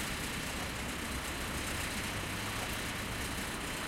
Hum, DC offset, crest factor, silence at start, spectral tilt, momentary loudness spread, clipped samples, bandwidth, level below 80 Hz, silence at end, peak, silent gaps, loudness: none; under 0.1%; 14 dB; 0 s; -3 dB/octave; 2 LU; under 0.1%; 16 kHz; -48 dBFS; 0 s; -24 dBFS; none; -37 LUFS